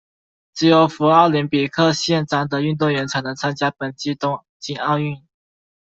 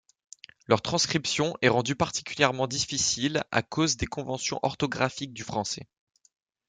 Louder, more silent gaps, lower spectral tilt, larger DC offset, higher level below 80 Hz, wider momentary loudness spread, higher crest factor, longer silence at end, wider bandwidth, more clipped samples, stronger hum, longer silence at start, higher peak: first, -19 LUFS vs -27 LUFS; first, 4.49-4.60 s vs none; first, -5.5 dB/octave vs -3.5 dB/octave; neither; about the same, -58 dBFS vs -56 dBFS; first, 12 LU vs 8 LU; second, 16 dB vs 24 dB; second, 0.65 s vs 0.85 s; second, 7.8 kHz vs 10.5 kHz; neither; neither; second, 0.55 s vs 0.7 s; first, -2 dBFS vs -6 dBFS